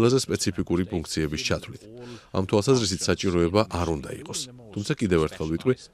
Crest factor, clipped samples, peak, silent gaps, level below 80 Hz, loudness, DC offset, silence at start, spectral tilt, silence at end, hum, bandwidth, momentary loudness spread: 20 dB; under 0.1%; -6 dBFS; none; -46 dBFS; -26 LUFS; under 0.1%; 0 s; -5 dB/octave; 0.1 s; none; 15 kHz; 11 LU